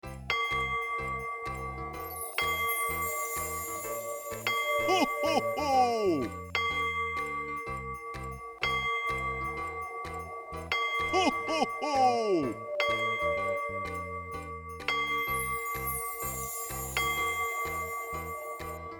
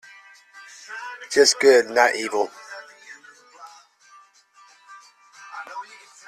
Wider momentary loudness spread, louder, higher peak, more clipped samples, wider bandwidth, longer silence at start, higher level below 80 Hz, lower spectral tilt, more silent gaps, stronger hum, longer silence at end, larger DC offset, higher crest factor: second, 11 LU vs 27 LU; second, -31 LUFS vs -18 LUFS; second, -14 dBFS vs -2 dBFS; neither; first, over 20 kHz vs 13.5 kHz; second, 0.05 s vs 0.9 s; first, -52 dBFS vs -72 dBFS; first, -3 dB/octave vs -0.5 dB/octave; neither; neither; second, 0 s vs 0.45 s; neither; about the same, 18 dB vs 22 dB